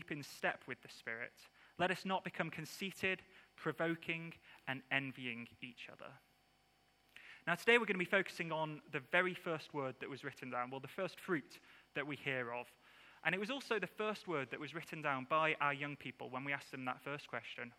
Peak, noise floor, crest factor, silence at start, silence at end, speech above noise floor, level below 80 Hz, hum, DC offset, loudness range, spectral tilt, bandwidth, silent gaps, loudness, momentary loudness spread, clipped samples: -18 dBFS; -74 dBFS; 24 dB; 0 s; 0.05 s; 33 dB; -82 dBFS; none; under 0.1%; 6 LU; -5 dB/octave; 16.5 kHz; none; -40 LUFS; 14 LU; under 0.1%